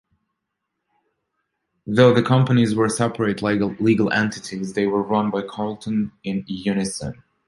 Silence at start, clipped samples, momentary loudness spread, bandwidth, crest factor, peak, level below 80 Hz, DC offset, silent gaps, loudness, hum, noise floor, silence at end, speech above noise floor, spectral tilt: 1.85 s; under 0.1%; 12 LU; 11.5 kHz; 18 dB; -2 dBFS; -54 dBFS; under 0.1%; none; -21 LUFS; none; -79 dBFS; 0.35 s; 59 dB; -6 dB/octave